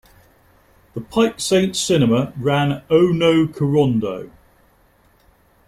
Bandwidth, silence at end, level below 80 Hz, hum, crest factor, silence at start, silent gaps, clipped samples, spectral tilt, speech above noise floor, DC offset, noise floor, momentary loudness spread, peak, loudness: 15 kHz; 1.4 s; -52 dBFS; none; 16 dB; 0.95 s; none; under 0.1%; -5.5 dB/octave; 39 dB; under 0.1%; -56 dBFS; 10 LU; -4 dBFS; -18 LUFS